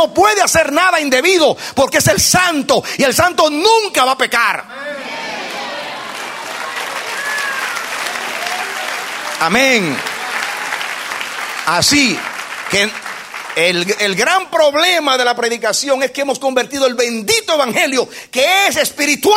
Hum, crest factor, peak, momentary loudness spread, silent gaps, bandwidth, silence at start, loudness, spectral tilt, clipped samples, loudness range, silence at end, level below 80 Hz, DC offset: none; 16 dB; 0 dBFS; 12 LU; none; 16.5 kHz; 0 s; -14 LUFS; -2 dB/octave; under 0.1%; 8 LU; 0 s; -48 dBFS; under 0.1%